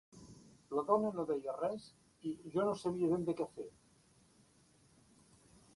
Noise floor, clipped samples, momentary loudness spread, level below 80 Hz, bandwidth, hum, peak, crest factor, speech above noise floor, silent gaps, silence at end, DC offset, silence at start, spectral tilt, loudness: -68 dBFS; under 0.1%; 18 LU; -74 dBFS; 11.5 kHz; none; -16 dBFS; 24 dB; 32 dB; none; 2.05 s; under 0.1%; 0.15 s; -7.5 dB/octave; -38 LUFS